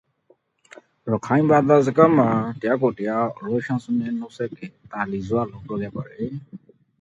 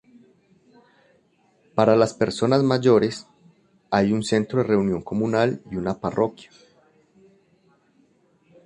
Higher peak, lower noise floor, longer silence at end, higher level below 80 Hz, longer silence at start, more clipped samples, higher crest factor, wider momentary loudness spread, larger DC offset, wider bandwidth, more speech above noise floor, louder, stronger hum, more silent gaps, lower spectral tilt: first, 0 dBFS vs -4 dBFS; about the same, -61 dBFS vs -62 dBFS; second, 0.45 s vs 2.2 s; about the same, -58 dBFS vs -56 dBFS; second, 1.05 s vs 1.75 s; neither; about the same, 22 dB vs 20 dB; first, 16 LU vs 9 LU; neither; second, 8 kHz vs 11 kHz; about the same, 40 dB vs 41 dB; about the same, -22 LUFS vs -22 LUFS; neither; neither; first, -8.5 dB/octave vs -6.5 dB/octave